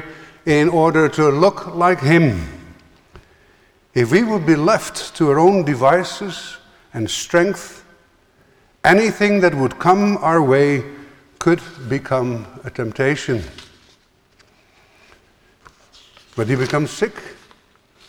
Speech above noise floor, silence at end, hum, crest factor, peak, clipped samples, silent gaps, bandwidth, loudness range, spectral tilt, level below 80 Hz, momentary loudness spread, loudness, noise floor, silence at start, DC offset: 40 dB; 0.75 s; none; 18 dB; 0 dBFS; under 0.1%; none; 18 kHz; 10 LU; -6 dB/octave; -48 dBFS; 15 LU; -17 LUFS; -56 dBFS; 0 s; under 0.1%